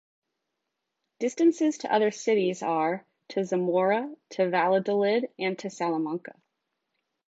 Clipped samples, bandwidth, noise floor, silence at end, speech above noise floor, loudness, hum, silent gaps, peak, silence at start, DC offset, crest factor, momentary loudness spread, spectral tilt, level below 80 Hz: under 0.1%; 8 kHz; -83 dBFS; 1 s; 57 dB; -27 LUFS; none; none; -12 dBFS; 1.2 s; under 0.1%; 16 dB; 9 LU; -5.5 dB/octave; -82 dBFS